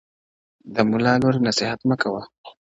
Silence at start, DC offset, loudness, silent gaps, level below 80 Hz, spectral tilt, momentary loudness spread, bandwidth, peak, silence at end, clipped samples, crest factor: 0.65 s; under 0.1%; -21 LUFS; 2.38-2.44 s; -56 dBFS; -5.5 dB/octave; 8 LU; 8 kHz; -2 dBFS; 0.3 s; under 0.1%; 20 dB